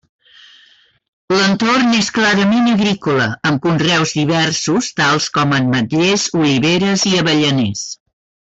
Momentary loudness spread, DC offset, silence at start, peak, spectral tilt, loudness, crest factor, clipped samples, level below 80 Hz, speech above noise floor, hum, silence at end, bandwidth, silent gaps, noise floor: 4 LU; under 0.1%; 1.3 s; -4 dBFS; -4 dB/octave; -14 LUFS; 12 dB; under 0.1%; -52 dBFS; 36 dB; none; 0.55 s; 8.4 kHz; none; -51 dBFS